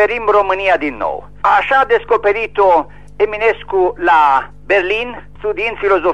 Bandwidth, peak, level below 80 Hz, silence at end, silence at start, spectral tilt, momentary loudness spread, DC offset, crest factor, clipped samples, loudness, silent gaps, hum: 8.6 kHz; -2 dBFS; -42 dBFS; 0 s; 0 s; -5.5 dB/octave; 9 LU; 1%; 12 dB; under 0.1%; -14 LUFS; none; 50 Hz at -40 dBFS